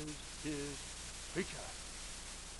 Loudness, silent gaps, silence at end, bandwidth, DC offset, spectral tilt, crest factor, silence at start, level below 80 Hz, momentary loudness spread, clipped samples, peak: -44 LUFS; none; 0 s; 11.5 kHz; under 0.1%; -3 dB/octave; 20 dB; 0 s; -54 dBFS; 5 LU; under 0.1%; -24 dBFS